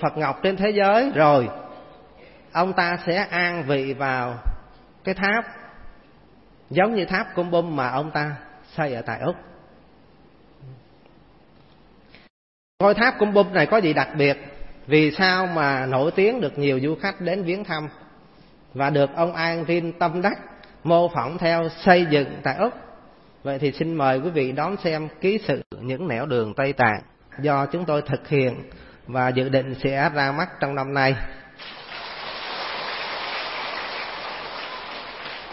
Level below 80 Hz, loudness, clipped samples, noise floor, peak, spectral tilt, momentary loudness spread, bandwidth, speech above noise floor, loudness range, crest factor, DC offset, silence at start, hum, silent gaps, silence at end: -46 dBFS; -22 LUFS; under 0.1%; -53 dBFS; -2 dBFS; -10 dB/octave; 15 LU; 5.8 kHz; 31 dB; 8 LU; 22 dB; 0.1%; 0 s; none; 12.30-12.78 s, 25.66-25.70 s; 0 s